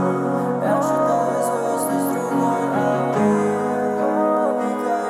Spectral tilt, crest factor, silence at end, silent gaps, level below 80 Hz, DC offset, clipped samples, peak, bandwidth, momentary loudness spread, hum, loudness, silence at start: -6.5 dB/octave; 12 dB; 0 s; none; -80 dBFS; under 0.1%; under 0.1%; -8 dBFS; 16 kHz; 3 LU; none; -20 LUFS; 0 s